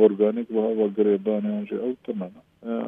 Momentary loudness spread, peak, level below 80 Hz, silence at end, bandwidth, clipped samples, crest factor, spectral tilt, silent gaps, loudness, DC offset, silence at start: 11 LU; -6 dBFS; -74 dBFS; 0 s; 3.8 kHz; under 0.1%; 18 dB; -10.5 dB/octave; none; -25 LUFS; under 0.1%; 0 s